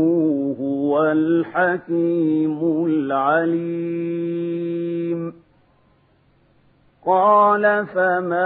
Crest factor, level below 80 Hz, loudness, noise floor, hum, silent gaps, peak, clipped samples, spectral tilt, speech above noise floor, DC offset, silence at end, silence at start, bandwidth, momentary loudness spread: 16 dB; -68 dBFS; -20 LUFS; -58 dBFS; none; none; -4 dBFS; under 0.1%; -11.5 dB/octave; 39 dB; under 0.1%; 0 s; 0 s; 4 kHz; 9 LU